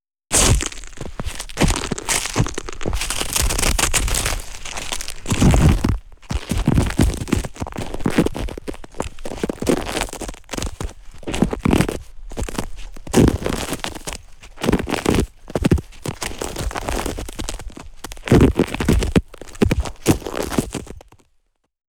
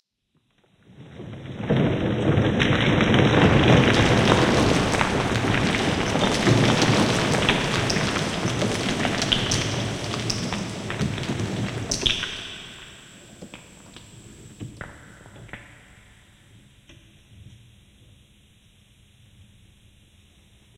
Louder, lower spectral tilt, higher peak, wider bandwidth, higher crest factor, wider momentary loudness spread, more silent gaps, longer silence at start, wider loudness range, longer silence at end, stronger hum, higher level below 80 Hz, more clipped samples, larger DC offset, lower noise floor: about the same, -21 LUFS vs -21 LUFS; about the same, -4.5 dB/octave vs -5 dB/octave; second, -4 dBFS vs 0 dBFS; first, over 20 kHz vs 16 kHz; second, 18 dB vs 24 dB; second, 16 LU vs 23 LU; neither; second, 0.3 s vs 1 s; second, 5 LU vs 17 LU; second, 0.9 s vs 3.35 s; neither; first, -26 dBFS vs -42 dBFS; neither; neither; second, -64 dBFS vs -70 dBFS